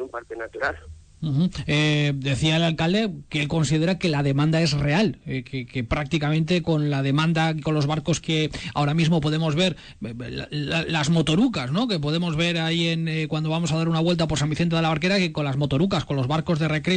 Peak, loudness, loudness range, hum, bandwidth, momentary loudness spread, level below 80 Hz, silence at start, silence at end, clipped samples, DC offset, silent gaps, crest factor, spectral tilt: -12 dBFS; -23 LUFS; 1 LU; none; 9.4 kHz; 8 LU; -46 dBFS; 0 s; 0 s; under 0.1%; under 0.1%; none; 10 dB; -6 dB/octave